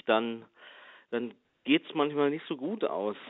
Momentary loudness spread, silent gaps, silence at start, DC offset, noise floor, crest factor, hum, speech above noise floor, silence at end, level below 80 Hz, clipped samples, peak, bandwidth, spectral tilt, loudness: 18 LU; none; 0.05 s; under 0.1%; -53 dBFS; 20 dB; none; 23 dB; 0 s; -82 dBFS; under 0.1%; -12 dBFS; 4.1 kHz; -3 dB/octave; -31 LUFS